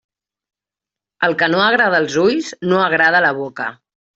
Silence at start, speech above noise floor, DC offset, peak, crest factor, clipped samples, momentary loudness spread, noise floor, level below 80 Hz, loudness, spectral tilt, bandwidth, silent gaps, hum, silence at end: 1.2 s; 72 dB; under 0.1%; -2 dBFS; 14 dB; under 0.1%; 11 LU; -88 dBFS; -60 dBFS; -15 LUFS; -4.5 dB/octave; 8 kHz; none; none; 0.45 s